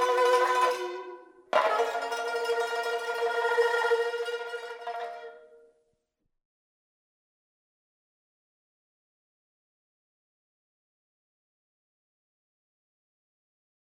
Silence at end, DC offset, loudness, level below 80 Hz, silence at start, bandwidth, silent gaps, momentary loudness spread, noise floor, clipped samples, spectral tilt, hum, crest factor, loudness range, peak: 8.35 s; under 0.1%; -28 LUFS; -88 dBFS; 0 s; 16 kHz; none; 14 LU; -79 dBFS; under 0.1%; -0.5 dB/octave; none; 24 dB; 15 LU; -8 dBFS